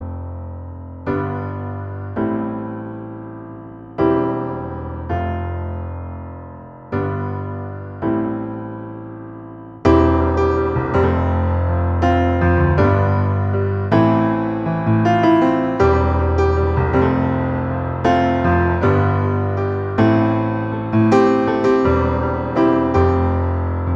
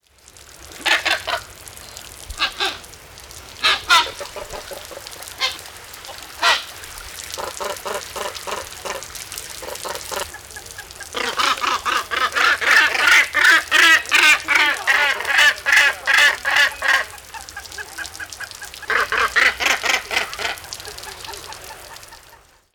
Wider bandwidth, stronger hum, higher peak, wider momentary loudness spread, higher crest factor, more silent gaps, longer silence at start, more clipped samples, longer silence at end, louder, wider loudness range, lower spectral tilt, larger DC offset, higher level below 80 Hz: second, 7.2 kHz vs over 20 kHz; neither; about the same, 0 dBFS vs -2 dBFS; second, 16 LU vs 22 LU; about the same, 16 dB vs 18 dB; neither; second, 0 s vs 0.5 s; neither; second, 0 s vs 0.4 s; about the same, -18 LUFS vs -16 LUFS; second, 9 LU vs 13 LU; first, -9 dB/octave vs 0.5 dB/octave; neither; first, -32 dBFS vs -50 dBFS